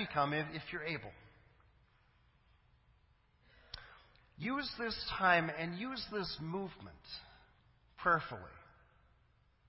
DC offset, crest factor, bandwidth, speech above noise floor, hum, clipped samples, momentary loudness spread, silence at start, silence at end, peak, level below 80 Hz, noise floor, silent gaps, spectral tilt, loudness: under 0.1%; 26 dB; 5.8 kHz; 33 dB; none; under 0.1%; 20 LU; 0 s; 1.05 s; -16 dBFS; -64 dBFS; -71 dBFS; none; -8 dB/octave; -37 LUFS